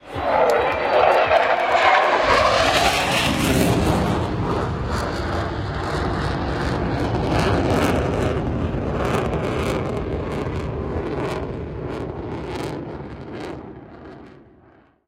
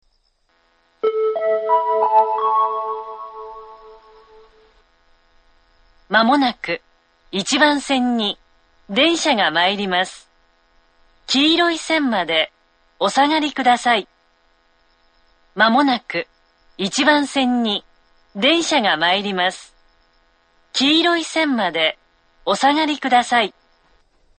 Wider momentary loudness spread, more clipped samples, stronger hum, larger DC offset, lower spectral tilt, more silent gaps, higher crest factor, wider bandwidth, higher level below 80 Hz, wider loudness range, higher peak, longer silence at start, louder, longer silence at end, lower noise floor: about the same, 14 LU vs 12 LU; neither; neither; neither; first, -5 dB/octave vs -3 dB/octave; neither; about the same, 18 dB vs 20 dB; first, 16.5 kHz vs 9.4 kHz; first, -34 dBFS vs -60 dBFS; first, 12 LU vs 5 LU; about the same, -2 dBFS vs 0 dBFS; second, 0.05 s vs 1.05 s; second, -21 LUFS vs -18 LUFS; second, 0.75 s vs 0.9 s; second, -53 dBFS vs -63 dBFS